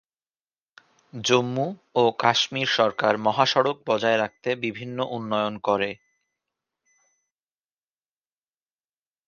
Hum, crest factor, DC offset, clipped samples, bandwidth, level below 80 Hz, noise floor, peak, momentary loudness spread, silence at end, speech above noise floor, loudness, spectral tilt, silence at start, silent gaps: none; 24 dB; under 0.1%; under 0.1%; 10 kHz; -68 dBFS; under -90 dBFS; -2 dBFS; 9 LU; 3.35 s; over 67 dB; -23 LUFS; -4 dB/octave; 1.15 s; none